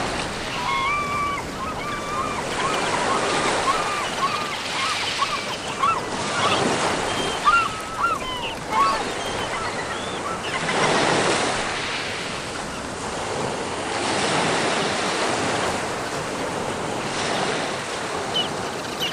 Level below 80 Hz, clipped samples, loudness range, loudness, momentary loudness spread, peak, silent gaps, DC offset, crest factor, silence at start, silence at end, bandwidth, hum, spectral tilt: -46 dBFS; under 0.1%; 3 LU; -23 LUFS; 7 LU; -6 dBFS; none; under 0.1%; 18 dB; 0 s; 0 s; 15.5 kHz; none; -3 dB/octave